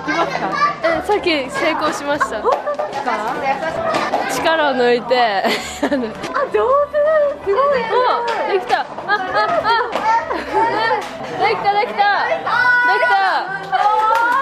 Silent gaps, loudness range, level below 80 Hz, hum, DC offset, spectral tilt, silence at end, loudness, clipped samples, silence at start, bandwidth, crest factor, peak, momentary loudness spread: none; 3 LU; -50 dBFS; none; under 0.1%; -3.5 dB/octave; 0 s; -17 LUFS; under 0.1%; 0 s; 13 kHz; 14 dB; -4 dBFS; 6 LU